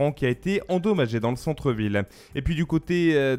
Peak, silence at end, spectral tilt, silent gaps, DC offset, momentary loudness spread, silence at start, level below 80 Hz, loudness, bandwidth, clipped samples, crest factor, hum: -8 dBFS; 0 s; -7 dB/octave; none; under 0.1%; 6 LU; 0 s; -42 dBFS; -25 LUFS; 15 kHz; under 0.1%; 16 dB; none